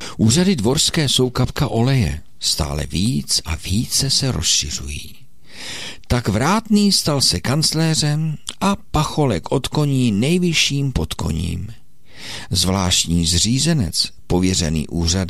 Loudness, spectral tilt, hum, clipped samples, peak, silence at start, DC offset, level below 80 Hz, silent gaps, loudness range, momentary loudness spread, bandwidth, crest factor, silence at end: -18 LUFS; -4 dB/octave; none; under 0.1%; -4 dBFS; 0 s; 2%; -34 dBFS; none; 2 LU; 10 LU; 16 kHz; 14 dB; 0 s